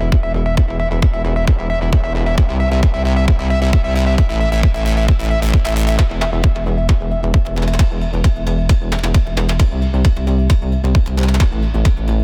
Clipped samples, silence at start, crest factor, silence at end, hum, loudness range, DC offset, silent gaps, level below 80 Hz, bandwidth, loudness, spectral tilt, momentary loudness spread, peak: under 0.1%; 0 s; 8 dB; 0 s; none; 1 LU; under 0.1%; none; -16 dBFS; 15 kHz; -16 LUFS; -6.5 dB/octave; 2 LU; -4 dBFS